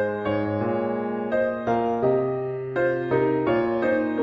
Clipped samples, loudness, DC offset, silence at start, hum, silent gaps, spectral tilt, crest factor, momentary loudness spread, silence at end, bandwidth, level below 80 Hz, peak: under 0.1%; -24 LUFS; under 0.1%; 0 s; none; none; -9 dB/octave; 14 dB; 4 LU; 0 s; 6.2 kHz; -56 dBFS; -10 dBFS